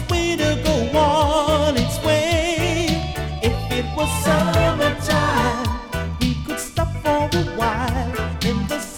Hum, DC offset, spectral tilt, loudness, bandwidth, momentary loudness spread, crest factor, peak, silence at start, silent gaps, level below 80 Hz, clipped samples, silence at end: none; under 0.1%; -5 dB/octave; -20 LUFS; 18.5 kHz; 6 LU; 10 dB; -8 dBFS; 0 s; none; -30 dBFS; under 0.1%; 0 s